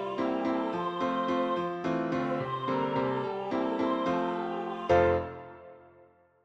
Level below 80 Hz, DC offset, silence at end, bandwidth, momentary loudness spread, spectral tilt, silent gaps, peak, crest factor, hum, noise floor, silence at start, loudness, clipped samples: -58 dBFS; under 0.1%; 0.65 s; 8 kHz; 7 LU; -7.5 dB/octave; none; -12 dBFS; 20 dB; none; -60 dBFS; 0 s; -30 LUFS; under 0.1%